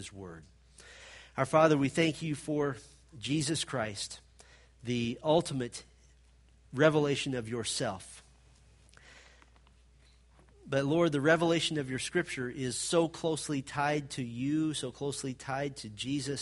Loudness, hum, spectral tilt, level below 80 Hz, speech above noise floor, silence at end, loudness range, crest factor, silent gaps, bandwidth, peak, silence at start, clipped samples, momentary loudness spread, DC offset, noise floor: -31 LUFS; none; -4.5 dB/octave; -62 dBFS; 30 dB; 0 s; 6 LU; 24 dB; none; 11.5 kHz; -10 dBFS; 0 s; under 0.1%; 16 LU; under 0.1%; -61 dBFS